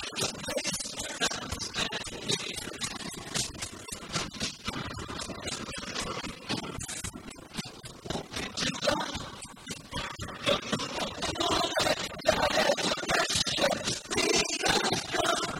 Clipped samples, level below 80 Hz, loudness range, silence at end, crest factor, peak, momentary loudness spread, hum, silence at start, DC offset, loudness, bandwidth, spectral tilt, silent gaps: under 0.1%; -52 dBFS; 9 LU; 0 s; 22 dB; -10 dBFS; 12 LU; none; 0 s; under 0.1%; -30 LUFS; 16 kHz; -2.5 dB/octave; none